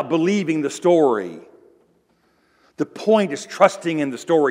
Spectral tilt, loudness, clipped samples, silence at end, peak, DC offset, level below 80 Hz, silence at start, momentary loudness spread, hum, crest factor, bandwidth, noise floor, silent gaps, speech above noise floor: -5.5 dB/octave; -19 LUFS; under 0.1%; 0 s; 0 dBFS; under 0.1%; -76 dBFS; 0 s; 9 LU; none; 20 dB; 15 kHz; -62 dBFS; none; 43 dB